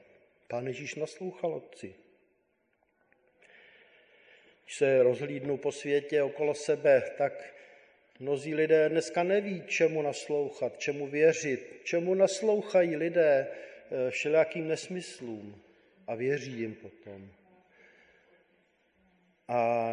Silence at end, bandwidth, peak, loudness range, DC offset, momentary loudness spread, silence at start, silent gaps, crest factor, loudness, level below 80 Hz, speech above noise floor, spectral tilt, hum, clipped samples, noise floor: 0 s; 10.5 kHz; -14 dBFS; 12 LU; under 0.1%; 18 LU; 0.5 s; none; 18 dB; -30 LUFS; -78 dBFS; 45 dB; -5 dB/octave; none; under 0.1%; -74 dBFS